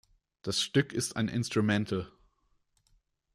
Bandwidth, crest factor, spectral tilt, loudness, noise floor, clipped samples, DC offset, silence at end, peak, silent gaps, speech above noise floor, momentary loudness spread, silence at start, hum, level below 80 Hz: 15.5 kHz; 18 dB; -4.5 dB/octave; -30 LUFS; -73 dBFS; under 0.1%; under 0.1%; 1.25 s; -14 dBFS; none; 43 dB; 9 LU; 0.45 s; none; -64 dBFS